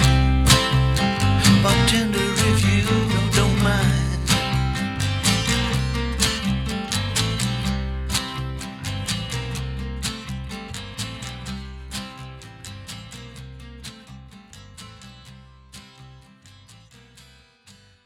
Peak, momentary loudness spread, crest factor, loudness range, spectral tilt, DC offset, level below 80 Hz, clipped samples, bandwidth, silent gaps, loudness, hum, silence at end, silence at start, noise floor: -2 dBFS; 22 LU; 20 dB; 21 LU; -4.5 dB/octave; under 0.1%; -30 dBFS; under 0.1%; 17 kHz; none; -21 LUFS; none; 0.35 s; 0 s; -52 dBFS